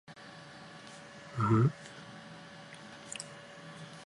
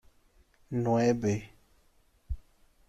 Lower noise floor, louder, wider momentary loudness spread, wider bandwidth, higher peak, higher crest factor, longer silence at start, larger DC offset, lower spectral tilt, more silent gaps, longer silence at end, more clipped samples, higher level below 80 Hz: second, -51 dBFS vs -65 dBFS; second, -33 LUFS vs -29 LUFS; first, 21 LU vs 17 LU; second, 11.5 kHz vs 13 kHz; about the same, -16 dBFS vs -14 dBFS; about the same, 20 dB vs 18 dB; second, 0.1 s vs 0.7 s; neither; about the same, -6.5 dB/octave vs -7 dB/octave; neither; second, 0 s vs 0.5 s; neither; second, -66 dBFS vs -50 dBFS